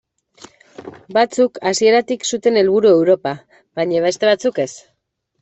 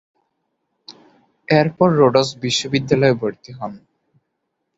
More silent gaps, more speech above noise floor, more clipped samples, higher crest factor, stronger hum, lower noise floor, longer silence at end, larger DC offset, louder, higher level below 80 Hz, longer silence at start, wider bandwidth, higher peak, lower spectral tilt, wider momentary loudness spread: neither; about the same, 55 dB vs 58 dB; neither; about the same, 14 dB vs 18 dB; neither; second, -70 dBFS vs -75 dBFS; second, 0.65 s vs 1 s; neither; about the same, -16 LUFS vs -17 LUFS; second, -62 dBFS vs -56 dBFS; about the same, 0.8 s vs 0.9 s; about the same, 8.4 kHz vs 8 kHz; about the same, -4 dBFS vs -2 dBFS; second, -4 dB/octave vs -5.5 dB/octave; second, 14 LU vs 17 LU